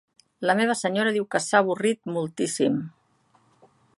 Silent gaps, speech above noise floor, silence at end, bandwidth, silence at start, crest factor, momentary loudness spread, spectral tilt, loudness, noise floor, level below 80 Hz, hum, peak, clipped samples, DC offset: none; 40 dB; 1.1 s; 11.5 kHz; 0.4 s; 22 dB; 8 LU; -4 dB/octave; -24 LUFS; -64 dBFS; -72 dBFS; none; -4 dBFS; under 0.1%; under 0.1%